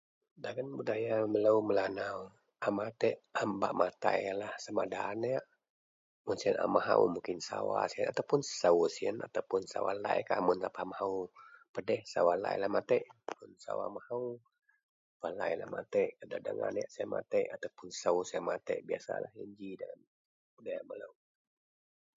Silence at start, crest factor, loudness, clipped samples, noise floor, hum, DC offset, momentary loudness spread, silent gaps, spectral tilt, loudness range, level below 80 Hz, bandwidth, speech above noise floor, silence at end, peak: 0.4 s; 24 dB; -35 LUFS; under 0.1%; under -90 dBFS; none; under 0.1%; 15 LU; 5.70-6.25 s, 11.69-11.74 s, 14.83-15.20 s, 20.07-20.57 s; -4 dB/octave; 6 LU; -76 dBFS; 7.6 kHz; over 56 dB; 1.1 s; -12 dBFS